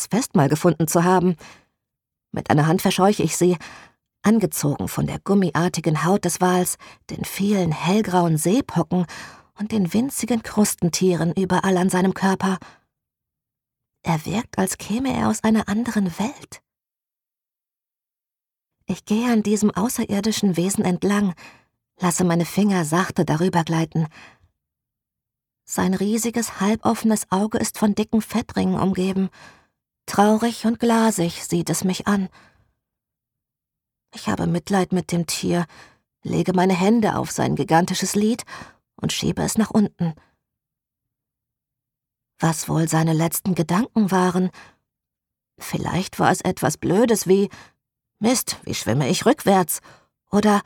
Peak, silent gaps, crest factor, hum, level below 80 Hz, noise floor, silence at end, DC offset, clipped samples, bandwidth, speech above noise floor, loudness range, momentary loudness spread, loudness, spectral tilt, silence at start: -2 dBFS; none; 20 dB; none; -52 dBFS; -90 dBFS; 0.05 s; under 0.1%; under 0.1%; 18.5 kHz; 70 dB; 5 LU; 9 LU; -21 LUFS; -5.5 dB/octave; 0 s